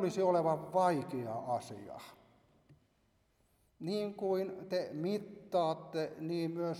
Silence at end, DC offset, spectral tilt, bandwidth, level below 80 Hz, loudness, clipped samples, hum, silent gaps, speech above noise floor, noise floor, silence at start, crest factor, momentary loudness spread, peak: 0 s; under 0.1%; -6.5 dB/octave; 15 kHz; -78 dBFS; -36 LUFS; under 0.1%; none; none; 39 dB; -74 dBFS; 0 s; 18 dB; 15 LU; -20 dBFS